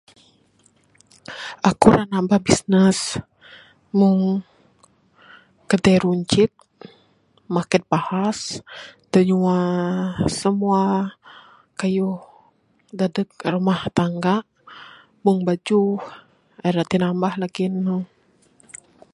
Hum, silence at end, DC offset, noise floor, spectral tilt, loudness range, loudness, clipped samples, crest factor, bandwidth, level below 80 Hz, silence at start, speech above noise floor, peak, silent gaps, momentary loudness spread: none; 1.1 s; under 0.1%; -60 dBFS; -6 dB/octave; 4 LU; -20 LUFS; under 0.1%; 22 dB; 11.5 kHz; -52 dBFS; 1.3 s; 41 dB; 0 dBFS; none; 17 LU